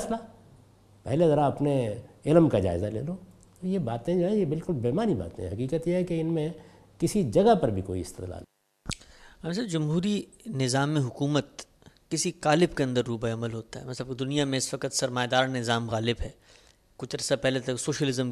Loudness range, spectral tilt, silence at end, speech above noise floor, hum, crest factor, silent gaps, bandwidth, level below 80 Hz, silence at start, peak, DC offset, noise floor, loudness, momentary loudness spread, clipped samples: 3 LU; -5.5 dB/octave; 0 s; 31 dB; none; 20 dB; none; 14 kHz; -50 dBFS; 0 s; -6 dBFS; under 0.1%; -58 dBFS; -28 LUFS; 15 LU; under 0.1%